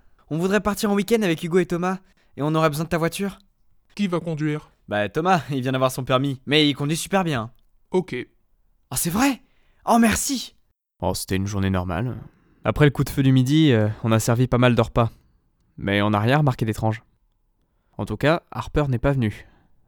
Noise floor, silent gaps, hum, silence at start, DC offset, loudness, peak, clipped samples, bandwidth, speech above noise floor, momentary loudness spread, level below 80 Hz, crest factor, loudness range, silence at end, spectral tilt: -66 dBFS; none; none; 0.3 s; under 0.1%; -22 LUFS; -2 dBFS; under 0.1%; over 20 kHz; 45 dB; 12 LU; -44 dBFS; 20 dB; 5 LU; 0.45 s; -5.5 dB/octave